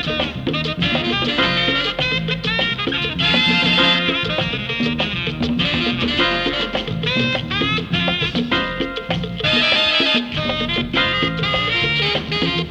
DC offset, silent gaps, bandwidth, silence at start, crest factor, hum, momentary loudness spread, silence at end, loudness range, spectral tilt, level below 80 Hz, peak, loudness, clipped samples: under 0.1%; none; 9.6 kHz; 0 s; 18 dB; none; 8 LU; 0 s; 3 LU; -5 dB/octave; -38 dBFS; -2 dBFS; -17 LUFS; under 0.1%